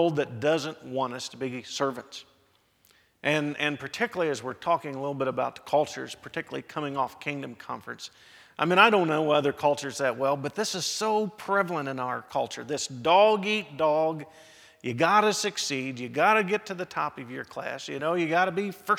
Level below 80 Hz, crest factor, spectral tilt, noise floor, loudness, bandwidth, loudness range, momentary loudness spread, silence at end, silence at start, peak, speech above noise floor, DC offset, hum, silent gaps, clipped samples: -72 dBFS; 24 dB; -4 dB/octave; -66 dBFS; -27 LUFS; 17 kHz; 6 LU; 15 LU; 0 s; 0 s; -4 dBFS; 39 dB; under 0.1%; none; none; under 0.1%